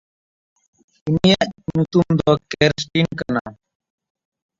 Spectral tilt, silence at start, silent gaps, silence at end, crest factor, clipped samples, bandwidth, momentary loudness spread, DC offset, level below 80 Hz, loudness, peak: -6 dB/octave; 1.05 s; 3.41-3.45 s; 1.05 s; 20 dB; under 0.1%; 7.8 kHz; 9 LU; under 0.1%; -48 dBFS; -19 LUFS; -2 dBFS